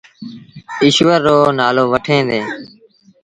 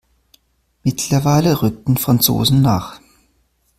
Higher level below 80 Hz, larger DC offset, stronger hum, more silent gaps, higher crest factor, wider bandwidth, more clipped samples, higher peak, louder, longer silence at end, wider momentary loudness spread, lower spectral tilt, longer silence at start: second, -52 dBFS vs -42 dBFS; neither; neither; neither; about the same, 16 dB vs 18 dB; second, 10.5 kHz vs 16 kHz; neither; about the same, 0 dBFS vs 0 dBFS; first, -13 LUFS vs -16 LUFS; second, 0.55 s vs 0.8 s; first, 20 LU vs 9 LU; about the same, -5 dB/octave vs -5.5 dB/octave; second, 0.2 s vs 0.85 s